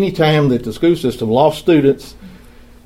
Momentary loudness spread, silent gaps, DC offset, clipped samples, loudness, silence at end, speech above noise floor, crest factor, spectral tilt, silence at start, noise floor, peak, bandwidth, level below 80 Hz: 4 LU; none; under 0.1%; under 0.1%; -14 LUFS; 0.5 s; 27 dB; 14 dB; -7 dB/octave; 0 s; -41 dBFS; 0 dBFS; 16 kHz; -42 dBFS